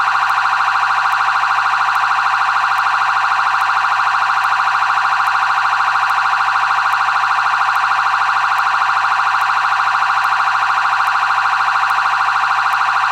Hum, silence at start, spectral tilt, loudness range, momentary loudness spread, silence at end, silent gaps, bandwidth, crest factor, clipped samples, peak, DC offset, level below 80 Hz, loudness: none; 0 s; 0 dB/octave; 0 LU; 0 LU; 0 s; none; 13.5 kHz; 12 dB; under 0.1%; -4 dBFS; under 0.1%; -66 dBFS; -14 LUFS